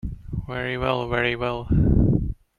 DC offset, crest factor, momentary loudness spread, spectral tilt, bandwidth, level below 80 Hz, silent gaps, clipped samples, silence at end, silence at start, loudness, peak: under 0.1%; 18 dB; 12 LU; -8.5 dB/octave; 6.8 kHz; -30 dBFS; none; under 0.1%; 0.25 s; 0.05 s; -23 LUFS; -6 dBFS